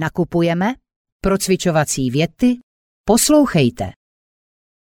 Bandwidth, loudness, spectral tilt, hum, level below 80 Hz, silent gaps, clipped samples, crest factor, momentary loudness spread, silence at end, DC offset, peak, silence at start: 18 kHz; -17 LUFS; -5 dB/octave; none; -40 dBFS; 0.96-1.05 s, 1.12-1.20 s, 2.63-3.04 s; under 0.1%; 16 dB; 14 LU; 0.9 s; under 0.1%; -2 dBFS; 0 s